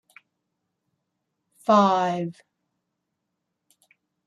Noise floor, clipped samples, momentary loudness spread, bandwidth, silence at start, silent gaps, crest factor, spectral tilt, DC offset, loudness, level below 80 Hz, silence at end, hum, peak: -80 dBFS; under 0.1%; 14 LU; 12 kHz; 1.7 s; none; 22 dB; -6.5 dB/octave; under 0.1%; -22 LUFS; -78 dBFS; 1.95 s; none; -6 dBFS